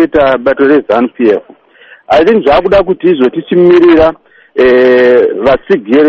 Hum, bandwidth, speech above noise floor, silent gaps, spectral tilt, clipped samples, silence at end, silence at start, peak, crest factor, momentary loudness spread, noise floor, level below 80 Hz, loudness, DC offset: none; 6.4 kHz; 33 dB; none; -7.5 dB/octave; 0.4%; 0 s; 0 s; 0 dBFS; 8 dB; 6 LU; -39 dBFS; -36 dBFS; -8 LUFS; under 0.1%